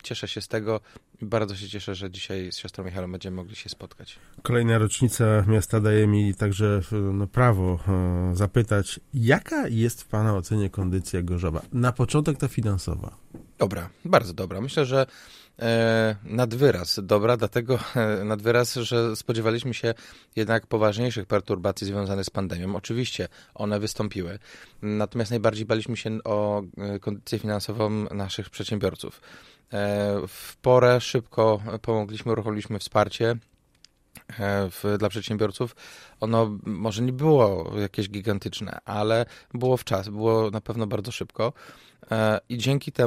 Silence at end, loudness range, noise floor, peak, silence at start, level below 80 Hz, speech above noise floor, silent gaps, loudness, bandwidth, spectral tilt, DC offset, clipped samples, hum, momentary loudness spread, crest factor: 0 s; 6 LU; -60 dBFS; -4 dBFS; 0.05 s; -48 dBFS; 35 dB; none; -25 LUFS; 15.5 kHz; -6 dB/octave; under 0.1%; under 0.1%; none; 12 LU; 20 dB